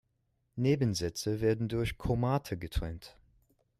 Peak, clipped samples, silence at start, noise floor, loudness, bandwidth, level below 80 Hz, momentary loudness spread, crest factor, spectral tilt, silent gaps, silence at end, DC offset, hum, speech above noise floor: -18 dBFS; under 0.1%; 0.55 s; -77 dBFS; -32 LUFS; 14.5 kHz; -46 dBFS; 10 LU; 16 dB; -6 dB/octave; none; 0.7 s; under 0.1%; none; 46 dB